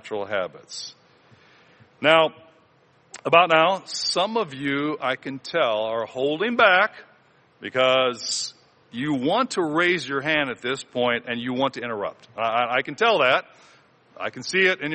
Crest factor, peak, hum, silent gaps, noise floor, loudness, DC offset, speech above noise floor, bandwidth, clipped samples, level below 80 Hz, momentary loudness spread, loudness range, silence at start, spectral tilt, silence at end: 24 dB; 0 dBFS; none; none; -59 dBFS; -22 LUFS; under 0.1%; 36 dB; 8.8 kHz; under 0.1%; -70 dBFS; 13 LU; 3 LU; 0.05 s; -3.5 dB/octave; 0 s